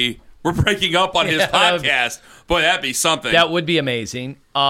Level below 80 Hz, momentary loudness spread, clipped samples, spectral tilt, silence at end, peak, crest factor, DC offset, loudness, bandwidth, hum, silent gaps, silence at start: -40 dBFS; 10 LU; under 0.1%; -3 dB/octave; 0 s; -2 dBFS; 16 dB; under 0.1%; -17 LUFS; 16.5 kHz; none; none; 0 s